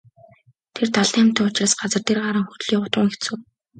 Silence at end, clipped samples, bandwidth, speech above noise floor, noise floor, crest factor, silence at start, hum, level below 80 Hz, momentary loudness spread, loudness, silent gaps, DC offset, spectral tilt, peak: 0.35 s; under 0.1%; 9.4 kHz; 35 dB; -55 dBFS; 20 dB; 0.75 s; none; -64 dBFS; 11 LU; -20 LUFS; none; under 0.1%; -3.5 dB/octave; -2 dBFS